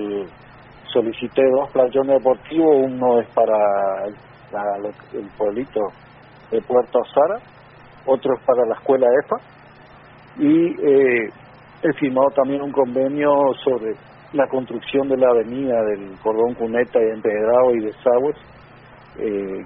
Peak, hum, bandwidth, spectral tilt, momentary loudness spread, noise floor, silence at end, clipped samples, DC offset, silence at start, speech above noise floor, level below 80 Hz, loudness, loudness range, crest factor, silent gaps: -4 dBFS; none; 4 kHz; -5 dB/octave; 11 LU; -45 dBFS; 0 s; under 0.1%; under 0.1%; 0 s; 27 dB; -58 dBFS; -19 LUFS; 5 LU; 16 dB; none